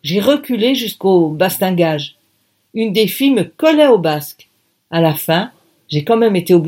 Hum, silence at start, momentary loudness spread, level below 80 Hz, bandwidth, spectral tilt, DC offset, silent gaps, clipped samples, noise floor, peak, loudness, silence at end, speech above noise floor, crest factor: none; 0.05 s; 11 LU; -64 dBFS; 17 kHz; -5.5 dB/octave; under 0.1%; none; under 0.1%; -62 dBFS; 0 dBFS; -14 LUFS; 0 s; 48 dB; 14 dB